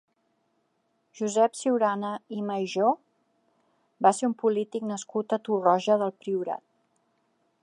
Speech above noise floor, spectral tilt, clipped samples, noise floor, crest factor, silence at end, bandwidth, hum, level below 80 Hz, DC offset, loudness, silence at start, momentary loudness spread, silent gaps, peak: 47 dB; -5 dB/octave; under 0.1%; -73 dBFS; 22 dB; 1.05 s; 11.5 kHz; none; -84 dBFS; under 0.1%; -27 LUFS; 1.15 s; 10 LU; none; -6 dBFS